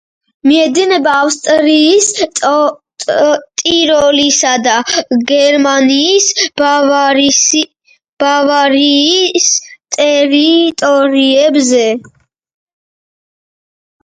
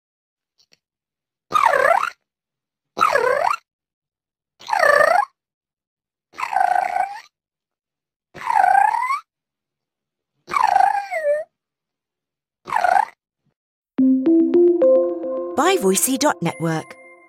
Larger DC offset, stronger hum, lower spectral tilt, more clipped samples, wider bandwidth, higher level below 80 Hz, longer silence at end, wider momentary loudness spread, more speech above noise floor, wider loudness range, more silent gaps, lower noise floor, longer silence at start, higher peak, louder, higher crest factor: neither; neither; second, -1 dB/octave vs -4 dB/octave; neither; second, 10 kHz vs 16 kHz; first, -54 dBFS vs -66 dBFS; first, 2 s vs 0.35 s; second, 5 LU vs 13 LU; first, over 80 dB vs 70 dB; second, 2 LU vs 6 LU; second, 8.09-8.17 s vs 3.73-3.79 s, 3.93-4.02 s, 5.54-5.61 s, 5.87-5.97 s, 8.16-8.20 s, 13.56-13.82 s; about the same, under -90 dBFS vs -90 dBFS; second, 0.45 s vs 1.5 s; about the same, 0 dBFS vs -2 dBFS; first, -9 LUFS vs -18 LUFS; second, 10 dB vs 18 dB